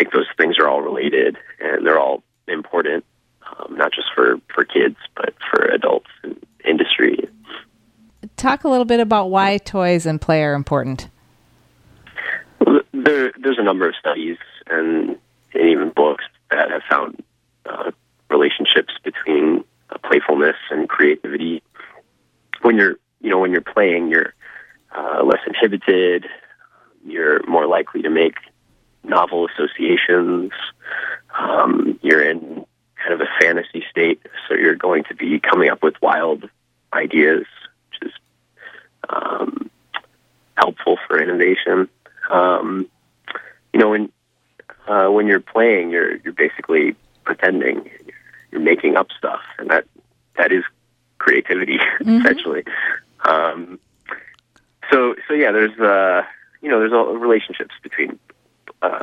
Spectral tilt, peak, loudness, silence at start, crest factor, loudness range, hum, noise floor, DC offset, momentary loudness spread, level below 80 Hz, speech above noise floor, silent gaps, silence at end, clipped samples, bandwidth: -5.5 dB/octave; 0 dBFS; -17 LUFS; 0 s; 18 dB; 3 LU; none; -63 dBFS; under 0.1%; 16 LU; -56 dBFS; 46 dB; none; 0 s; under 0.1%; 10 kHz